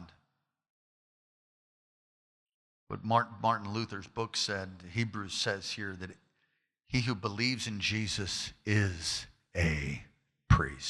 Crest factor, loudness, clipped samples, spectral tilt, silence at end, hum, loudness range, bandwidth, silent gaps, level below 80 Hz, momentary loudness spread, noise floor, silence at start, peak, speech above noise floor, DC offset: 26 dB; -33 LUFS; under 0.1%; -4.5 dB/octave; 0 s; none; 4 LU; 12 kHz; 0.70-2.46 s, 2.54-2.87 s; -48 dBFS; 10 LU; -81 dBFS; 0 s; -10 dBFS; 47 dB; under 0.1%